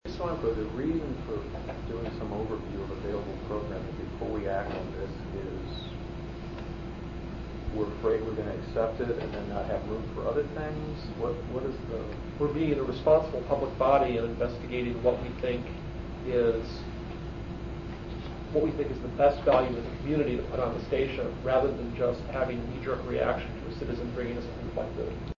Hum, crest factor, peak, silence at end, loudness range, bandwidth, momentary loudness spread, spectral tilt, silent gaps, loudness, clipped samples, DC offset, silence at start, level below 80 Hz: none; 20 dB; -10 dBFS; 0.05 s; 7 LU; 7.4 kHz; 13 LU; -8 dB/octave; none; -31 LUFS; under 0.1%; under 0.1%; 0.05 s; -42 dBFS